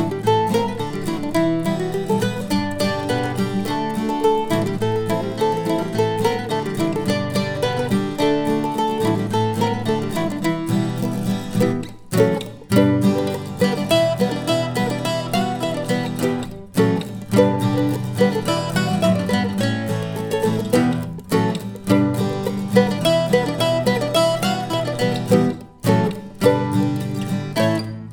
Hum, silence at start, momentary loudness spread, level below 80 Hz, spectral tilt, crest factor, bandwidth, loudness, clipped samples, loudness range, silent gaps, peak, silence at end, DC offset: none; 0 s; 6 LU; -48 dBFS; -6 dB/octave; 18 dB; over 20 kHz; -20 LUFS; under 0.1%; 2 LU; none; -2 dBFS; 0 s; under 0.1%